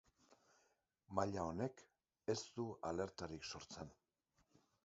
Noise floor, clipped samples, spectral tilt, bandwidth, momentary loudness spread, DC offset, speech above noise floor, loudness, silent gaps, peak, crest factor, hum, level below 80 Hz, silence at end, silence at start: -83 dBFS; under 0.1%; -5 dB/octave; 7.6 kHz; 10 LU; under 0.1%; 38 dB; -46 LUFS; none; -22 dBFS; 26 dB; none; -68 dBFS; 0.9 s; 0.3 s